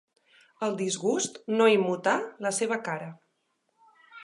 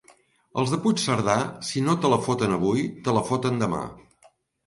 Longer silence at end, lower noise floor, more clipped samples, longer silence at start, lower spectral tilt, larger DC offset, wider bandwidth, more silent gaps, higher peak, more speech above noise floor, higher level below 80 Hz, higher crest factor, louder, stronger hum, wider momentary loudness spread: second, 0 s vs 0.65 s; first, -75 dBFS vs -60 dBFS; neither; about the same, 0.6 s vs 0.55 s; second, -3.5 dB/octave vs -5.5 dB/octave; neither; about the same, 11.5 kHz vs 11.5 kHz; neither; about the same, -8 dBFS vs -6 dBFS; first, 48 dB vs 36 dB; second, -84 dBFS vs -56 dBFS; about the same, 20 dB vs 18 dB; second, -27 LUFS vs -24 LUFS; neither; first, 12 LU vs 6 LU